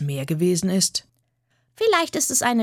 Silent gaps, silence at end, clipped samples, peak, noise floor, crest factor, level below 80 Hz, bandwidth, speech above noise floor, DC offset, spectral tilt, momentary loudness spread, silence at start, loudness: none; 0 s; under 0.1%; -6 dBFS; -69 dBFS; 18 dB; -64 dBFS; 17.5 kHz; 47 dB; under 0.1%; -3.5 dB/octave; 5 LU; 0 s; -21 LUFS